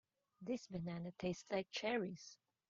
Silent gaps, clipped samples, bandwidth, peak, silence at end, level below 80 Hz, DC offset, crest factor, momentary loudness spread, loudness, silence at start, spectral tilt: none; under 0.1%; 7.6 kHz; -26 dBFS; 0.35 s; -74 dBFS; under 0.1%; 18 dB; 13 LU; -44 LUFS; 0.4 s; -4.5 dB/octave